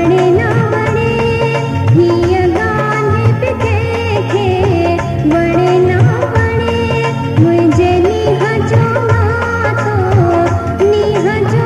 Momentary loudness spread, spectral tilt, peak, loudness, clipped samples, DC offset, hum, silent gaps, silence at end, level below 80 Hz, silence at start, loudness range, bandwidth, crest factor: 4 LU; -7.5 dB/octave; 0 dBFS; -12 LUFS; under 0.1%; under 0.1%; none; none; 0 s; -32 dBFS; 0 s; 1 LU; 11 kHz; 12 dB